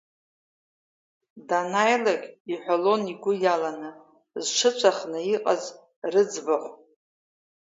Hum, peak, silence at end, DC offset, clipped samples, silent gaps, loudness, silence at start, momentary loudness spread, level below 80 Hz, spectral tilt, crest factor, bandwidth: none; -4 dBFS; 0.9 s; under 0.1%; under 0.1%; 2.40-2.45 s, 5.96-6.02 s; -25 LUFS; 1.35 s; 14 LU; -80 dBFS; -3 dB/octave; 22 dB; 7.8 kHz